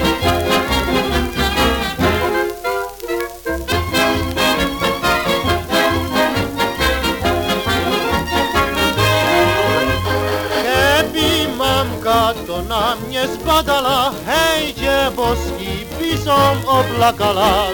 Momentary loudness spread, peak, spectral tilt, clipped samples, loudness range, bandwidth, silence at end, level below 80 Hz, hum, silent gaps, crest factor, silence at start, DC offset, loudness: 7 LU; -2 dBFS; -4 dB/octave; under 0.1%; 3 LU; 19 kHz; 0 s; -32 dBFS; none; none; 16 dB; 0 s; under 0.1%; -16 LUFS